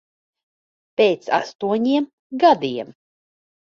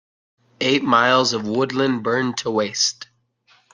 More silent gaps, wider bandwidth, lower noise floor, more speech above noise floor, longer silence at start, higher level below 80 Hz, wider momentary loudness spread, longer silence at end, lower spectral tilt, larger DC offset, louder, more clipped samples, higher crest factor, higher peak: first, 1.55-1.59 s, 2.13-2.30 s vs none; second, 7.2 kHz vs 10.5 kHz; first, under -90 dBFS vs -59 dBFS; first, over 71 dB vs 40 dB; first, 1 s vs 0.6 s; about the same, -68 dBFS vs -66 dBFS; first, 14 LU vs 7 LU; first, 0.95 s vs 0.7 s; first, -5.5 dB/octave vs -3.5 dB/octave; neither; about the same, -20 LUFS vs -19 LUFS; neither; about the same, 20 dB vs 20 dB; about the same, -2 dBFS vs -2 dBFS